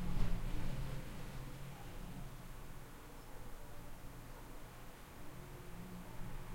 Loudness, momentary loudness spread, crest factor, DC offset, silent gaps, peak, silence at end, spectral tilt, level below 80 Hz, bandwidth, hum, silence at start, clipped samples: -50 LUFS; 10 LU; 20 dB; under 0.1%; none; -22 dBFS; 0 s; -5.5 dB/octave; -46 dBFS; 16.5 kHz; none; 0 s; under 0.1%